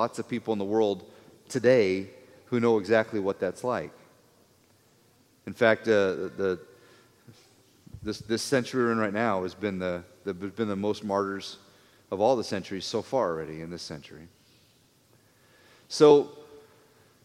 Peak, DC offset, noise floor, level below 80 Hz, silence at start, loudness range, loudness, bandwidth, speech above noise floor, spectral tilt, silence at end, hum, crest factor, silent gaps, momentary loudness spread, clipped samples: -4 dBFS; under 0.1%; -62 dBFS; -68 dBFS; 0 s; 5 LU; -27 LUFS; 14 kHz; 36 dB; -5.5 dB/octave; 0.65 s; none; 24 dB; none; 16 LU; under 0.1%